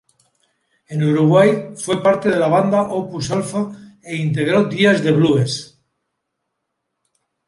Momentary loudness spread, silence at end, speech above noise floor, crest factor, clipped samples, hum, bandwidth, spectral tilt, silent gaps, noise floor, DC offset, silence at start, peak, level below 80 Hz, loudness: 10 LU; 1.8 s; 60 dB; 16 dB; under 0.1%; none; 11.5 kHz; -6 dB/octave; none; -76 dBFS; under 0.1%; 0.9 s; -2 dBFS; -58 dBFS; -17 LUFS